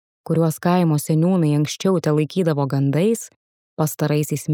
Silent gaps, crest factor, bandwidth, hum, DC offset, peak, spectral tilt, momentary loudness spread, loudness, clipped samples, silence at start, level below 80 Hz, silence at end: 3.36-3.77 s; 14 dB; 18.5 kHz; none; under 0.1%; -6 dBFS; -6.5 dB/octave; 7 LU; -20 LUFS; under 0.1%; 0.3 s; -68 dBFS; 0 s